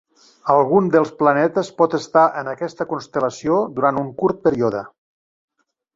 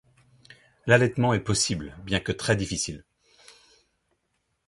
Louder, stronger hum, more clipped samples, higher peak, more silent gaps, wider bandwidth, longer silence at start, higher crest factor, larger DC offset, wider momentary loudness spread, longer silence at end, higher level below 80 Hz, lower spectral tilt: first, -19 LUFS vs -25 LUFS; neither; neither; first, -2 dBFS vs -6 dBFS; neither; second, 7.8 kHz vs 11.5 kHz; second, 0.45 s vs 0.85 s; about the same, 18 dB vs 22 dB; neither; about the same, 10 LU vs 12 LU; second, 1.1 s vs 1.7 s; second, -60 dBFS vs -50 dBFS; first, -6.5 dB/octave vs -4 dB/octave